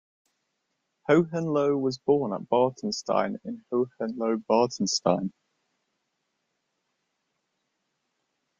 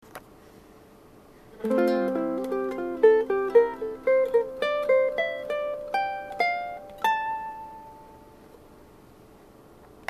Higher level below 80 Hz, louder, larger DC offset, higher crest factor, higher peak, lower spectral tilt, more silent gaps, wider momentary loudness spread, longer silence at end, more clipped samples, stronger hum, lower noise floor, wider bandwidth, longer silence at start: second, -70 dBFS vs -60 dBFS; about the same, -26 LUFS vs -25 LUFS; neither; about the same, 22 dB vs 20 dB; about the same, -8 dBFS vs -6 dBFS; about the same, -5 dB/octave vs -5.5 dB/octave; neither; second, 8 LU vs 16 LU; first, 3.3 s vs 1.65 s; neither; neither; first, -79 dBFS vs -52 dBFS; second, 7.8 kHz vs 14 kHz; first, 1.1 s vs 0.15 s